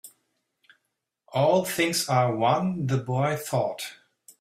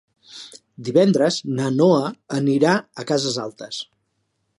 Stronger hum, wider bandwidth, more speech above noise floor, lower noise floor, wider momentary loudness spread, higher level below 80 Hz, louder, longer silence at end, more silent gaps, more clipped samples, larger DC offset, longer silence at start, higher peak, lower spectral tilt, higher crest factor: neither; first, 16 kHz vs 11.5 kHz; first, 56 dB vs 52 dB; first, -80 dBFS vs -71 dBFS; second, 8 LU vs 21 LU; about the same, -66 dBFS vs -68 dBFS; second, -25 LUFS vs -20 LUFS; second, 0.45 s vs 0.75 s; neither; neither; neither; second, 0.05 s vs 0.35 s; second, -8 dBFS vs -2 dBFS; about the same, -5 dB/octave vs -5.5 dB/octave; about the same, 18 dB vs 18 dB